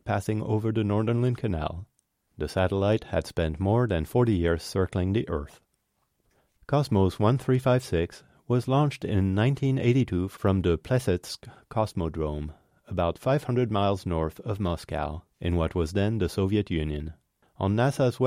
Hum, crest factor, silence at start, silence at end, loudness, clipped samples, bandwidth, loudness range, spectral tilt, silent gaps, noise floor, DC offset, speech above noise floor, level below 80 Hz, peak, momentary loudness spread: none; 16 dB; 0.05 s; 0 s; -27 LUFS; under 0.1%; 15.5 kHz; 3 LU; -7.5 dB/octave; none; -74 dBFS; under 0.1%; 49 dB; -44 dBFS; -10 dBFS; 9 LU